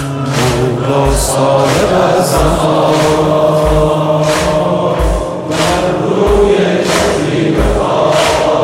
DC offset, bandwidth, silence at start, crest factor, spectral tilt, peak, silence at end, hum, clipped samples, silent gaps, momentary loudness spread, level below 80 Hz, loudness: under 0.1%; 16.5 kHz; 0 s; 10 dB; -5 dB/octave; 0 dBFS; 0 s; none; under 0.1%; none; 3 LU; -22 dBFS; -11 LUFS